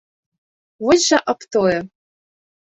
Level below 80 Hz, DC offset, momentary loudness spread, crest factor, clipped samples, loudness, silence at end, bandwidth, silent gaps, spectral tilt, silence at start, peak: -56 dBFS; under 0.1%; 10 LU; 18 dB; under 0.1%; -17 LUFS; 0.75 s; 8.4 kHz; none; -3 dB/octave; 0.8 s; -2 dBFS